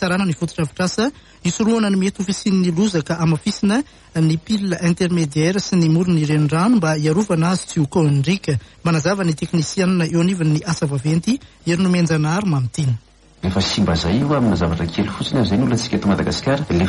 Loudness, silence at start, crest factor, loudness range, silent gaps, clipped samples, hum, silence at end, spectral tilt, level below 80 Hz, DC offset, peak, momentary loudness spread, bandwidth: -18 LUFS; 0 s; 12 dB; 2 LU; none; under 0.1%; none; 0 s; -6 dB/octave; -42 dBFS; under 0.1%; -4 dBFS; 6 LU; 11.5 kHz